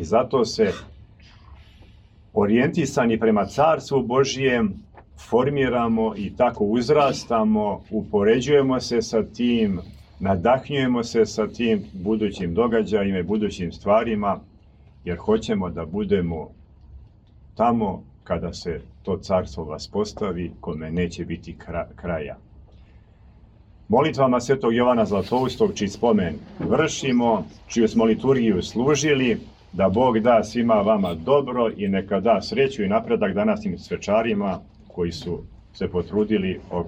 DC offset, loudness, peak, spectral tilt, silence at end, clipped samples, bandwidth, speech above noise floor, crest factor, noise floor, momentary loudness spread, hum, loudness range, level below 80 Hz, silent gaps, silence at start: under 0.1%; -22 LUFS; -6 dBFS; -6 dB/octave; 0 s; under 0.1%; 8.8 kHz; 29 dB; 16 dB; -50 dBFS; 11 LU; none; 7 LU; -46 dBFS; none; 0 s